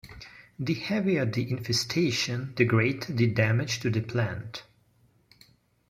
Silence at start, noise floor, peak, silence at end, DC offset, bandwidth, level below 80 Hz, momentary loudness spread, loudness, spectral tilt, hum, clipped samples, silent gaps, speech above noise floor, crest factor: 0.05 s; -64 dBFS; -8 dBFS; 1.25 s; under 0.1%; 15.5 kHz; -60 dBFS; 16 LU; -27 LUFS; -5.5 dB/octave; none; under 0.1%; none; 38 dB; 22 dB